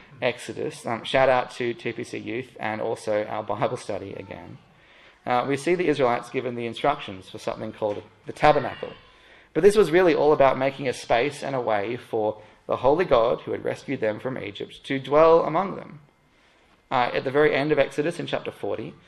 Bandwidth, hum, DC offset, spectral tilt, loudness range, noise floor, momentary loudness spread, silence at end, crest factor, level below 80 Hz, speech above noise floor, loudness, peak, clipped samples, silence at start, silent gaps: 12.5 kHz; none; under 0.1%; -5.5 dB/octave; 6 LU; -60 dBFS; 14 LU; 0.15 s; 22 dB; -54 dBFS; 36 dB; -24 LUFS; -2 dBFS; under 0.1%; 0.1 s; none